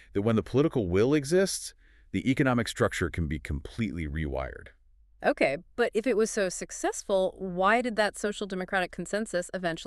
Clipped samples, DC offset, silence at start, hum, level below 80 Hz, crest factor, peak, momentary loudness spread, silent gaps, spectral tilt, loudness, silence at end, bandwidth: under 0.1%; under 0.1%; 0.15 s; none; -46 dBFS; 18 dB; -10 dBFS; 9 LU; none; -5 dB/octave; -28 LUFS; 0 s; 13.5 kHz